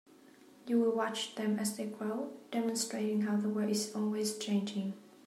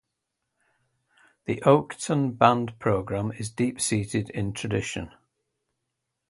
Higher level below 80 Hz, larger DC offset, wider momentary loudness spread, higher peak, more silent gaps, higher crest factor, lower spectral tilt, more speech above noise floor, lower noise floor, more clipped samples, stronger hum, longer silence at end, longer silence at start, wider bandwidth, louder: second, -88 dBFS vs -54 dBFS; neither; second, 7 LU vs 12 LU; second, -20 dBFS vs -4 dBFS; neither; second, 14 dB vs 24 dB; about the same, -4.5 dB/octave vs -5.5 dB/octave; second, 25 dB vs 57 dB; second, -59 dBFS vs -82 dBFS; neither; neither; second, 0.2 s vs 1.2 s; second, 0.25 s vs 1.5 s; first, 15.5 kHz vs 12 kHz; second, -34 LUFS vs -25 LUFS